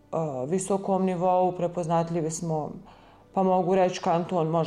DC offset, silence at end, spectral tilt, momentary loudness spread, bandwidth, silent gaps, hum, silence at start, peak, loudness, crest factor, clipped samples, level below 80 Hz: under 0.1%; 0 s; -6.5 dB/octave; 7 LU; 12 kHz; none; none; 0.1 s; -12 dBFS; -26 LUFS; 12 dB; under 0.1%; -62 dBFS